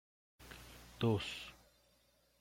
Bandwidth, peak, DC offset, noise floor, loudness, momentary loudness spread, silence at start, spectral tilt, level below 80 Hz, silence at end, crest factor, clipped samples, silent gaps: 16.5 kHz; -22 dBFS; under 0.1%; -73 dBFS; -39 LUFS; 20 LU; 0.4 s; -6 dB/octave; -64 dBFS; 0.9 s; 22 dB; under 0.1%; none